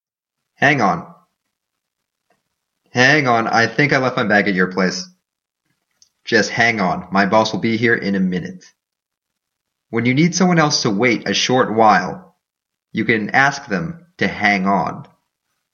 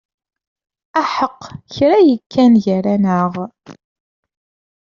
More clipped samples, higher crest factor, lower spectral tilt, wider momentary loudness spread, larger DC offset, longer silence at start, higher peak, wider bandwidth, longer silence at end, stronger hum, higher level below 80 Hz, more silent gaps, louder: neither; about the same, 18 dB vs 14 dB; second, -4.5 dB/octave vs -6 dB/octave; second, 12 LU vs 17 LU; neither; second, 0.6 s vs 0.95 s; about the same, 0 dBFS vs -2 dBFS; about the same, 7.4 kHz vs 7.2 kHz; second, 0.7 s vs 1.2 s; neither; about the same, -58 dBFS vs -58 dBFS; second, none vs 2.26-2.30 s; about the same, -16 LUFS vs -15 LUFS